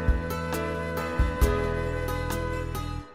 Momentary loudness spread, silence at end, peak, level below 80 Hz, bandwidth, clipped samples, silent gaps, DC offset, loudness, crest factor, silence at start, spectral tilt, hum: 6 LU; 0 s; -10 dBFS; -30 dBFS; 16 kHz; under 0.1%; none; 0.3%; -29 LUFS; 18 dB; 0 s; -6 dB/octave; none